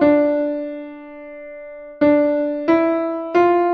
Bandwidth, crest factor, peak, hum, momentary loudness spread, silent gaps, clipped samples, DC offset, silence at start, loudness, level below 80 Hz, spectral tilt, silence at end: 6.2 kHz; 14 dB; -4 dBFS; none; 20 LU; none; under 0.1%; under 0.1%; 0 s; -18 LUFS; -56 dBFS; -8 dB/octave; 0 s